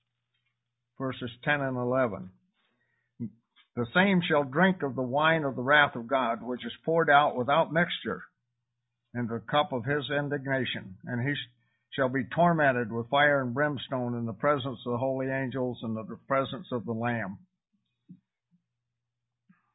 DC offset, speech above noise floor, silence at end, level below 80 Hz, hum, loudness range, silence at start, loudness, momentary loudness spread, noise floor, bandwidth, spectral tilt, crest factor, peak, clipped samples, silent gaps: under 0.1%; 58 dB; 1.6 s; -66 dBFS; none; 8 LU; 1 s; -28 LUFS; 14 LU; -86 dBFS; 4 kHz; -10 dB/octave; 22 dB; -8 dBFS; under 0.1%; none